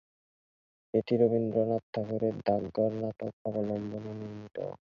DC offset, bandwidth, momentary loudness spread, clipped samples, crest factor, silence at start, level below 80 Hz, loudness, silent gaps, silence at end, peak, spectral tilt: under 0.1%; 6.6 kHz; 13 LU; under 0.1%; 20 dB; 0.95 s; -66 dBFS; -32 LUFS; 1.83-1.93 s, 3.33-3.45 s; 0.2 s; -12 dBFS; -9.5 dB/octave